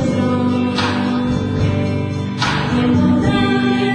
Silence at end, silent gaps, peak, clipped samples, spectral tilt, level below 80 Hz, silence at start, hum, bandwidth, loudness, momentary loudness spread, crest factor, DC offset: 0 s; none; -4 dBFS; under 0.1%; -6.5 dB/octave; -36 dBFS; 0 s; none; 10 kHz; -17 LUFS; 5 LU; 12 dB; under 0.1%